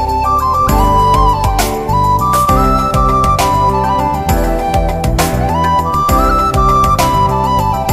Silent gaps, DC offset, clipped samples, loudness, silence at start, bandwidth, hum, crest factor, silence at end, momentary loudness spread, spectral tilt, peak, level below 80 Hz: none; under 0.1%; under 0.1%; -12 LUFS; 0 s; 16 kHz; none; 12 dB; 0 s; 4 LU; -5.5 dB/octave; 0 dBFS; -18 dBFS